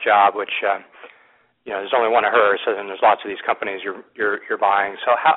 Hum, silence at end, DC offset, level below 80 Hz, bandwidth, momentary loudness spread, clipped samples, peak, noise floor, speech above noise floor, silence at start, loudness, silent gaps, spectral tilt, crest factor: none; 0 s; under 0.1%; -68 dBFS; 4.1 kHz; 11 LU; under 0.1%; -2 dBFS; -57 dBFS; 38 dB; 0 s; -19 LUFS; none; 0.5 dB/octave; 18 dB